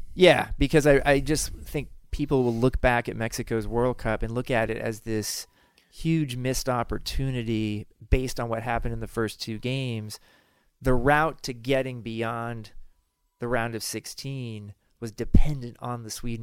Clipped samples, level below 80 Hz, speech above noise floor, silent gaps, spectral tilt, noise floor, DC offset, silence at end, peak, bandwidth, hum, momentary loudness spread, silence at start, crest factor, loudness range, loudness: under 0.1%; -34 dBFS; 42 dB; none; -5 dB/octave; -67 dBFS; under 0.1%; 0 s; -4 dBFS; 16.5 kHz; none; 14 LU; 0 s; 20 dB; 7 LU; -27 LUFS